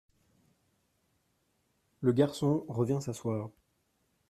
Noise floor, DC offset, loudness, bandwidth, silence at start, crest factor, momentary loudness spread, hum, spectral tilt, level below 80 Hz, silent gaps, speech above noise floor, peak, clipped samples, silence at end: -76 dBFS; under 0.1%; -31 LUFS; 14 kHz; 2 s; 22 dB; 9 LU; none; -7.5 dB/octave; -70 dBFS; none; 46 dB; -12 dBFS; under 0.1%; 0.8 s